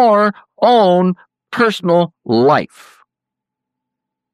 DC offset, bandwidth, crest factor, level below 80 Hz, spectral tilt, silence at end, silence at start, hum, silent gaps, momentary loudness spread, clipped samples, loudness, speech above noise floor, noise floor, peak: under 0.1%; 13.5 kHz; 14 dB; -66 dBFS; -7 dB/octave; 1.7 s; 0 s; none; none; 11 LU; under 0.1%; -14 LUFS; 70 dB; -83 dBFS; -2 dBFS